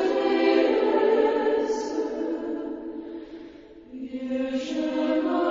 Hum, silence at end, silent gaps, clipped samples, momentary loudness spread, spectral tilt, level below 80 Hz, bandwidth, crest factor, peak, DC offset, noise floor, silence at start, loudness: none; 0 s; none; under 0.1%; 18 LU; -4.5 dB/octave; -60 dBFS; 7.6 kHz; 16 dB; -10 dBFS; under 0.1%; -45 dBFS; 0 s; -25 LUFS